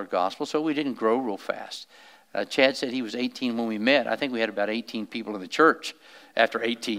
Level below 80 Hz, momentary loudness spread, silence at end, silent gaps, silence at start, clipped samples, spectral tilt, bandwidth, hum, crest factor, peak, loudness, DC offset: -86 dBFS; 12 LU; 0 s; none; 0 s; under 0.1%; -4 dB/octave; 16 kHz; none; 24 dB; -2 dBFS; -26 LUFS; under 0.1%